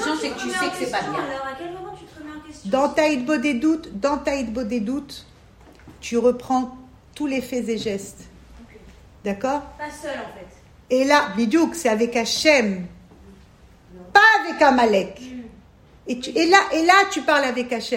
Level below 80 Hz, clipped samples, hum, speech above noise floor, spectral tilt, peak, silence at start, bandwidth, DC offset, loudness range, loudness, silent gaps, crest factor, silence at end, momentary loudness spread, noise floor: -52 dBFS; under 0.1%; none; 29 dB; -3.5 dB/octave; -2 dBFS; 0 s; 16 kHz; under 0.1%; 10 LU; -20 LUFS; none; 20 dB; 0 s; 21 LU; -49 dBFS